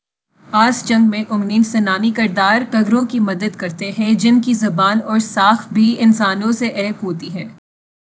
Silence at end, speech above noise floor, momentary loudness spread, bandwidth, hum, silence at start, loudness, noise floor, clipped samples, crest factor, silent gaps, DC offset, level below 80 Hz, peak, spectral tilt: 0.65 s; 35 dB; 10 LU; 8 kHz; none; 0.5 s; -15 LUFS; -50 dBFS; under 0.1%; 16 dB; none; under 0.1%; -64 dBFS; 0 dBFS; -5 dB/octave